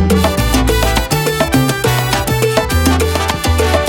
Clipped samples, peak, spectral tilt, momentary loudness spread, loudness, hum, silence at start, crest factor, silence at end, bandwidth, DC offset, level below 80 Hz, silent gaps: under 0.1%; 0 dBFS; -4.5 dB/octave; 2 LU; -13 LUFS; none; 0 s; 12 dB; 0 s; 19.5 kHz; under 0.1%; -20 dBFS; none